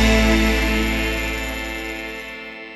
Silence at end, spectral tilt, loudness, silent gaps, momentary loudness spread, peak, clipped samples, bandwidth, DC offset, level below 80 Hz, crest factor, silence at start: 0 s; -4.5 dB/octave; -21 LUFS; none; 14 LU; -4 dBFS; under 0.1%; 13.5 kHz; under 0.1%; -26 dBFS; 16 dB; 0 s